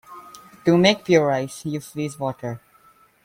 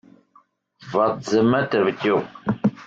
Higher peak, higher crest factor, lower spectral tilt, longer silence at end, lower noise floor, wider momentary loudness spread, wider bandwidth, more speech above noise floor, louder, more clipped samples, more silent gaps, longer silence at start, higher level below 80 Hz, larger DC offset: first, -2 dBFS vs -6 dBFS; about the same, 20 dB vs 16 dB; about the same, -5.5 dB/octave vs -6.5 dB/octave; first, 0.65 s vs 0 s; about the same, -55 dBFS vs -58 dBFS; first, 20 LU vs 6 LU; first, 16 kHz vs 7.8 kHz; about the same, 35 dB vs 38 dB; about the same, -21 LUFS vs -21 LUFS; neither; neither; second, 0.1 s vs 0.8 s; about the same, -60 dBFS vs -62 dBFS; neither